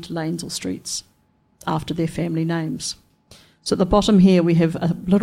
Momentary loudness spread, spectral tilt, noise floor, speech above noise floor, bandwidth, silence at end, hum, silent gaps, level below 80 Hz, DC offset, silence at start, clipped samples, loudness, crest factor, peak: 15 LU; -6 dB/octave; -61 dBFS; 42 dB; 14.5 kHz; 0 s; none; none; -42 dBFS; under 0.1%; 0 s; under 0.1%; -20 LUFS; 16 dB; -4 dBFS